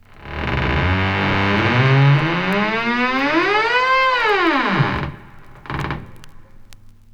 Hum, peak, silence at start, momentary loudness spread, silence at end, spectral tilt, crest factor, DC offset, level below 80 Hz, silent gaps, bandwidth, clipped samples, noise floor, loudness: none; -4 dBFS; 0.15 s; 13 LU; 0.4 s; -6.5 dB/octave; 14 dB; under 0.1%; -36 dBFS; none; 8 kHz; under 0.1%; -41 dBFS; -17 LUFS